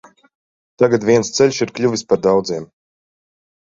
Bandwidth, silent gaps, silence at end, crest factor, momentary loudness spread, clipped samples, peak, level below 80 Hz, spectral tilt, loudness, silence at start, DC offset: 7.8 kHz; none; 1 s; 16 dB; 6 LU; under 0.1%; -2 dBFS; -56 dBFS; -5 dB/octave; -16 LUFS; 0.8 s; under 0.1%